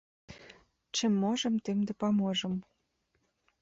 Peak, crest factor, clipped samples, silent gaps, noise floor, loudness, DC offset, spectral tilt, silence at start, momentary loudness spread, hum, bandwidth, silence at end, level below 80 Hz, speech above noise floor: -20 dBFS; 14 dB; under 0.1%; none; -77 dBFS; -31 LUFS; under 0.1%; -5 dB/octave; 0.3 s; 10 LU; none; 8 kHz; 1 s; -70 dBFS; 47 dB